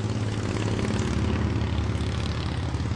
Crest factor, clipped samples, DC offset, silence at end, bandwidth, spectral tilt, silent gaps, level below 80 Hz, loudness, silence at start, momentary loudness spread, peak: 14 dB; under 0.1%; under 0.1%; 0 s; 11 kHz; -6.5 dB/octave; none; -36 dBFS; -27 LUFS; 0 s; 3 LU; -12 dBFS